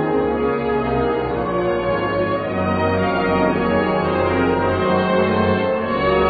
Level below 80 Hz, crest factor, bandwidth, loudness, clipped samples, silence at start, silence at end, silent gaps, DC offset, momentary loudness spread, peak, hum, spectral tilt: -38 dBFS; 14 dB; 4.9 kHz; -19 LUFS; under 0.1%; 0 s; 0 s; none; under 0.1%; 3 LU; -4 dBFS; none; -5 dB/octave